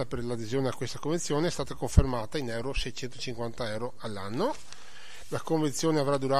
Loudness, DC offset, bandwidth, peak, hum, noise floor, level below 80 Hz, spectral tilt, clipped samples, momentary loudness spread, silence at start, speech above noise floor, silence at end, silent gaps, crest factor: -31 LUFS; 2%; 15 kHz; -4 dBFS; none; -49 dBFS; -36 dBFS; -5.5 dB/octave; under 0.1%; 11 LU; 0 s; 20 dB; 0 s; none; 26 dB